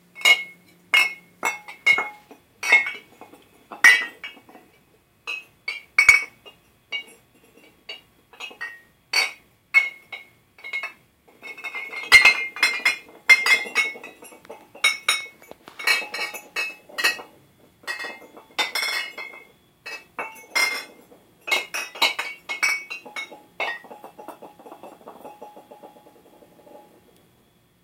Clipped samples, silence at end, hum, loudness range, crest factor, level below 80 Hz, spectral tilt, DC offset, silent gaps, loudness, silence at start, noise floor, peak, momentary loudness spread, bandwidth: under 0.1%; 1.05 s; none; 12 LU; 24 dB; -62 dBFS; 1 dB/octave; under 0.1%; none; -20 LUFS; 0.15 s; -60 dBFS; -2 dBFS; 25 LU; 16.5 kHz